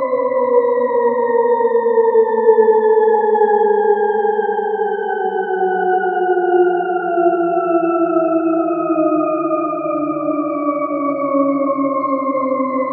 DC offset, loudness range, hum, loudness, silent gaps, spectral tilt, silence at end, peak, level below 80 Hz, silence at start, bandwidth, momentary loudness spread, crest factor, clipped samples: under 0.1%; 4 LU; none; -16 LUFS; none; -11.5 dB/octave; 0 s; 0 dBFS; -84 dBFS; 0 s; 3.8 kHz; 6 LU; 14 dB; under 0.1%